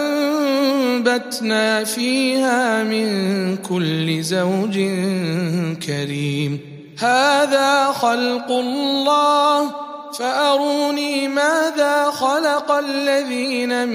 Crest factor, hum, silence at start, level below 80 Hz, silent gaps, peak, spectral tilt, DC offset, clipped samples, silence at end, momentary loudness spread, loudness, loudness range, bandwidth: 16 dB; none; 0 s; -70 dBFS; none; -2 dBFS; -4.5 dB/octave; under 0.1%; under 0.1%; 0 s; 7 LU; -18 LUFS; 4 LU; 15.5 kHz